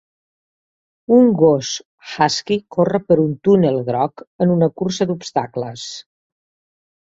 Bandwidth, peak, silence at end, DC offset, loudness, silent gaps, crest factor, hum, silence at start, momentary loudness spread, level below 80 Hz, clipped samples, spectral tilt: 7.8 kHz; -2 dBFS; 1.15 s; under 0.1%; -17 LUFS; 1.85-1.98 s, 4.27-4.39 s; 16 dB; none; 1.1 s; 15 LU; -58 dBFS; under 0.1%; -6 dB/octave